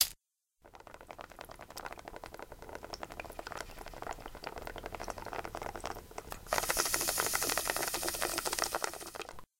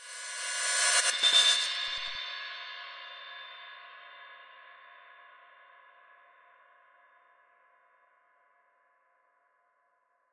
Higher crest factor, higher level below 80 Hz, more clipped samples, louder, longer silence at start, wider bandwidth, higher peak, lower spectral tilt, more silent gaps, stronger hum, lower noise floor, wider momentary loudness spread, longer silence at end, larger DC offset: first, 32 dB vs 24 dB; first, -54 dBFS vs -78 dBFS; neither; second, -36 LUFS vs -26 LUFS; about the same, 0 s vs 0 s; first, 17 kHz vs 11.5 kHz; first, -8 dBFS vs -12 dBFS; first, -1 dB/octave vs 4.5 dB/octave; neither; neither; about the same, -74 dBFS vs -73 dBFS; second, 18 LU vs 27 LU; second, 0.15 s vs 5.1 s; neither